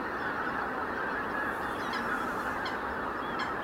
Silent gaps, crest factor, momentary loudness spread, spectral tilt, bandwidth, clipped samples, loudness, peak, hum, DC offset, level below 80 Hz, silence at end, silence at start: none; 14 dB; 2 LU; -4.5 dB/octave; 16 kHz; under 0.1%; -33 LUFS; -20 dBFS; none; under 0.1%; -56 dBFS; 0 s; 0 s